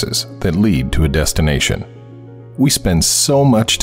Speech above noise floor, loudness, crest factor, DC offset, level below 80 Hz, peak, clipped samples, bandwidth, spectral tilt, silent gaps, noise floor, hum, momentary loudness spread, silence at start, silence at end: 21 dB; -14 LUFS; 12 dB; under 0.1%; -26 dBFS; -4 dBFS; under 0.1%; 16.5 kHz; -4 dB/octave; none; -35 dBFS; none; 8 LU; 0 s; 0 s